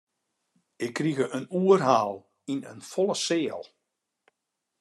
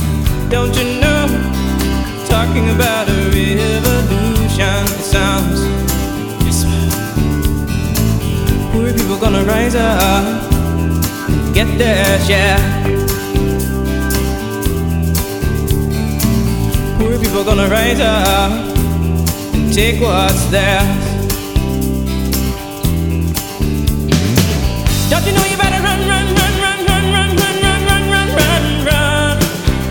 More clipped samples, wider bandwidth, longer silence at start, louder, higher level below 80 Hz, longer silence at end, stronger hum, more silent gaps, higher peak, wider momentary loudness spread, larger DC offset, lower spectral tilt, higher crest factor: neither; second, 12.5 kHz vs over 20 kHz; first, 0.8 s vs 0 s; second, -27 LUFS vs -14 LUFS; second, -80 dBFS vs -20 dBFS; first, 1.2 s vs 0 s; neither; neither; second, -6 dBFS vs 0 dBFS; first, 14 LU vs 5 LU; neither; about the same, -5 dB/octave vs -5 dB/octave; first, 22 dB vs 14 dB